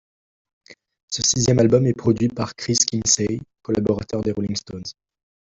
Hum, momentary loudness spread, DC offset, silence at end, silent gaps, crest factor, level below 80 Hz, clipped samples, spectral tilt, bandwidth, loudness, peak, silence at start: none; 13 LU; under 0.1%; 0.65 s; 1.03-1.08 s; 20 dB; -50 dBFS; under 0.1%; -4.5 dB/octave; 8.2 kHz; -20 LUFS; -2 dBFS; 0.7 s